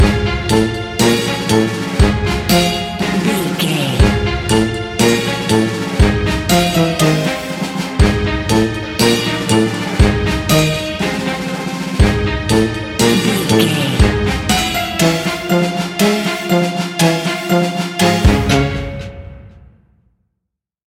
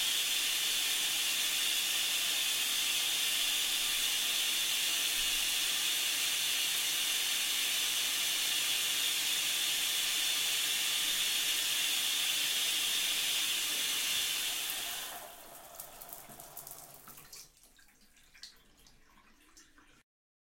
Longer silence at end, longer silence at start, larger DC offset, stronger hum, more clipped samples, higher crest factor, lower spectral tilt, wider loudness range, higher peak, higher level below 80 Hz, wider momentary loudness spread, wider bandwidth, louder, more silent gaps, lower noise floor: first, 1.5 s vs 0.85 s; about the same, 0 s vs 0 s; neither; neither; neither; about the same, 14 dB vs 18 dB; first, -5 dB/octave vs 2.5 dB/octave; second, 1 LU vs 12 LU; first, 0 dBFS vs -16 dBFS; first, -24 dBFS vs -66 dBFS; second, 5 LU vs 17 LU; about the same, 17 kHz vs 16.5 kHz; first, -15 LUFS vs -29 LUFS; neither; first, -77 dBFS vs -63 dBFS